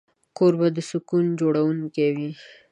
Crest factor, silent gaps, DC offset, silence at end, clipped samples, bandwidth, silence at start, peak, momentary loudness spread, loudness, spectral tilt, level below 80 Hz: 16 dB; none; under 0.1%; 0.3 s; under 0.1%; 10.5 kHz; 0.4 s; -8 dBFS; 10 LU; -23 LUFS; -7.5 dB/octave; -72 dBFS